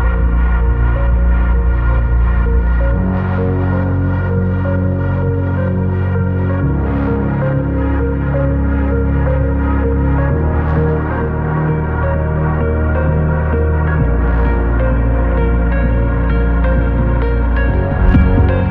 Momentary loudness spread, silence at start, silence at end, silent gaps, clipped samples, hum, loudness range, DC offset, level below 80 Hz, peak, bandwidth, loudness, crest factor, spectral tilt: 2 LU; 0 s; 0 s; none; under 0.1%; none; 1 LU; under 0.1%; -16 dBFS; 0 dBFS; 3.8 kHz; -15 LUFS; 12 dB; -11.5 dB/octave